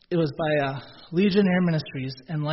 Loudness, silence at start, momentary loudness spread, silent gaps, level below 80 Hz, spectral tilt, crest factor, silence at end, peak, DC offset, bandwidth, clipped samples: -25 LUFS; 0.1 s; 12 LU; none; -58 dBFS; -6 dB/octave; 16 dB; 0 s; -8 dBFS; under 0.1%; 6 kHz; under 0.1%